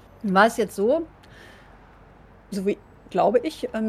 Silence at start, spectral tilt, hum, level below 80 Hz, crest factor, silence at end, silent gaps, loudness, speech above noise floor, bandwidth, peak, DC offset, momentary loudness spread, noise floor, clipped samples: 0.25 s; -5.5 dB/octave; none; -56 dBFS; 20 dB; 0 s; none; -23 LUFS; 28 dB; 15.5 kHz; -4 dBFS; under 0.1%; 14 LU; -50 dBFS; under 0.1%